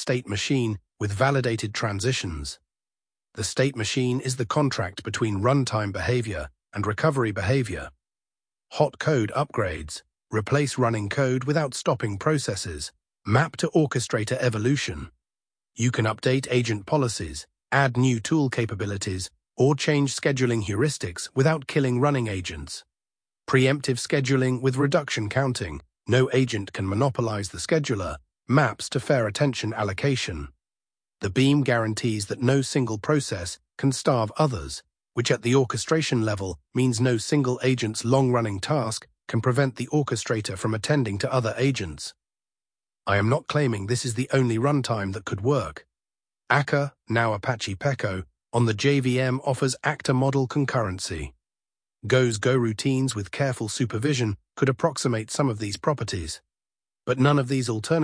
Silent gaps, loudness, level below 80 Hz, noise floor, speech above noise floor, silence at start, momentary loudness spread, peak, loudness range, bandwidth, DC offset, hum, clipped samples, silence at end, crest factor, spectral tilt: none; -25 LUFS; -50 dBFS; under -90 dBFS; over 66 dB; 0 s; 10 LU; -4 dBFS; 3 LU; 10.5 kHz; under 0.1%; none; under 0.1%; 0 s; 20 dB; -5.5 dB/octave